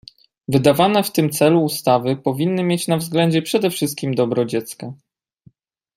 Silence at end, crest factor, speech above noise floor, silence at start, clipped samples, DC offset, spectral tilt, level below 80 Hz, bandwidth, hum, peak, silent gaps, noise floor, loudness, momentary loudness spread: 1 s; 18 dB; 36 dB; 0.5 s; under 0.1%; under 0.1%; -5.5 dB/octave; -60 dBFS; 16 kHz; none; -2 dBFS; none; -54 dBFS; -18 LUFS; 8 LU